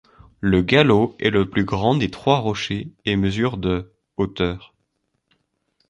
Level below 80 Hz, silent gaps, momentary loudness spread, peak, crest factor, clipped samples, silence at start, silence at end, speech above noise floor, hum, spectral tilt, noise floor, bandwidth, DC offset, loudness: -42 dBFS; none; 11 LU; -2 dBFS; 20 dB; under 0.1%; 0.4 s; 1.3 s; 53 dB; none; -6.5 dB/octave; -72 dBFS; 10 kHz; under 0.1%; -20 LUFS